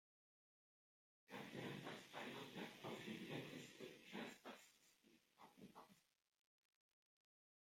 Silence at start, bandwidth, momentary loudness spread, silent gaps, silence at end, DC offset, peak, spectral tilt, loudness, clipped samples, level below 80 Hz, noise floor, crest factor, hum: 1.3 s; 16 kHz; 12 LU; none; 1.75 s; under 0.1%; -40 dBFS; -4.5 dB/octave; -55 LUFS; under 0.1%; under -90 dBFS; -77 dBFS; 20 dB; none